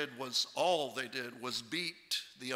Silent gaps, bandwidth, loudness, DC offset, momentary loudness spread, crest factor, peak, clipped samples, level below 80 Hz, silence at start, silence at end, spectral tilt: none; 16 kHz; -36 LUFS; under 0.1%; 8 LU; 18 dB; -20 dBFS; under 0.1%; -82 dBFS; 0 s; 0 s; -2 dB/octave